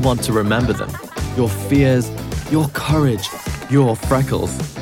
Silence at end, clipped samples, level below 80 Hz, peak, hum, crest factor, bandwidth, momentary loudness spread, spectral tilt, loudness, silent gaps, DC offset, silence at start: 0 s; under 0.1%; -34 dBFS; -2 dBFS; none; 16 dB; 17 kHz; 9 LU; -6 dB/octave; -18 LUFS; none; under 0.1%; 0 s